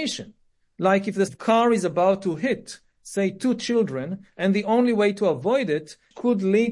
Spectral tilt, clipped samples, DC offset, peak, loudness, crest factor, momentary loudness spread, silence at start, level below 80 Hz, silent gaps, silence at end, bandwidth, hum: -5.5 dB/octave; under 0.1%; under 0.1%; -6 dBFS; -23 LUFS; 16 dB; 11 LU; 0 s; -66 dBFS; none; 0 s; 11.5 kHz; none